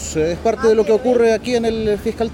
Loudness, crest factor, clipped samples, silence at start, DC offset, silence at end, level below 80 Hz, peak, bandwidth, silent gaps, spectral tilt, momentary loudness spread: -17 LUFS; 12 dB; under 0.1%; 0 s; under 0.1%; 0 s; -38 dBFS; -4 dBFS; 16 kHz; none; -5 dB/octave; 6 LU